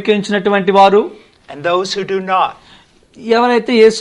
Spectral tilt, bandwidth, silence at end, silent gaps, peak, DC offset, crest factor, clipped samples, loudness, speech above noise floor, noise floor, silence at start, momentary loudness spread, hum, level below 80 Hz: -5 dB/octave; 10.5 kHz; 0 s; none; 0 dBFS; under 0.1%; 14 dB; under 0.1%; -13 LUFS; 33 dB; -45 dBFS; 0 s; 10 LU; none; -56 dBFS